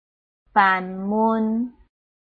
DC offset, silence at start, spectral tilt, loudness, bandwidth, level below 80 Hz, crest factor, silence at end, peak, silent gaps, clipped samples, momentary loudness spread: under 0.1%; 0.55 s; -8.5 dB/octave; -21 LUFS; 4.7 kHz; -60 dBFS; 20 dB; 0.55 s; -4 dBFS; none; under 0.1%; 9 LU